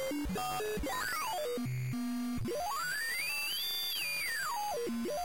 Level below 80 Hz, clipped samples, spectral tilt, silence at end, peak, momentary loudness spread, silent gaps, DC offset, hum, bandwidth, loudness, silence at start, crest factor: -54 dBFS; under 0.1%; -3.5 dB/octave; 0 s; -26 dBFS; 4 LU; none; 0.3%; none; 16.5 kHz; -35 LUFS; 0 s; 8 dB